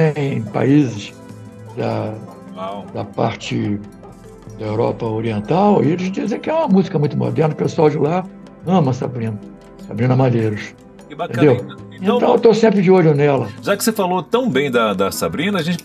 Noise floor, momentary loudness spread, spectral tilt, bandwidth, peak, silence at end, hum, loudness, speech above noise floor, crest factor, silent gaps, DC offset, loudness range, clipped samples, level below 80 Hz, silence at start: -38 dBFS; 18 LU; -6.5 dB/octave; 15 kHz; 0 dBFS; 0 s; none; -17 LUFS; 22 dB; 16 dB; none; under 0.1%; 9 LU; under 0.1%; -52 dBFS; 0 s